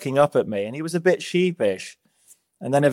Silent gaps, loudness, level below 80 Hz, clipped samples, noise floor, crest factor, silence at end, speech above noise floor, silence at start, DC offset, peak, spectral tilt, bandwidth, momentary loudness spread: none; -22 LUFS; -70 dBFS; under 0.1%; -57 dBFS; 18 dB; 0 s; 36 dB; 0 s; under 0.1%; -4 dBFS; -6 dB/octave; 15.5 kHz; 13 LU